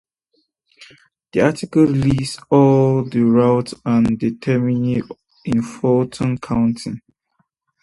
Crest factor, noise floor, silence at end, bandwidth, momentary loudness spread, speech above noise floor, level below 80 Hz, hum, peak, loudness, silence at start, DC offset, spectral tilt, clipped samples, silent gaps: 18 dB; -67 dBFS; 0.85 s; 11.5 kHz; 10 LU; 51 dB; -46 dBFS; none; 0 dBFS; -17 LUFS; 0.8 s; under 0.1%; -7.5 dB/octave; under 0.1%; none